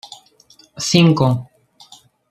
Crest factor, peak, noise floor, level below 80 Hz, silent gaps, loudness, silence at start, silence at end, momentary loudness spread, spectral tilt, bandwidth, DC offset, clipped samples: 18 dB; 0 dBFS; -51 dBFS; -54 dBFS; none; -16 LUFS; 0.05 s; 0.85 s; 14 LU; -5.5 dB/octave; 13.5 kHz; under 0.1%; under 0.1%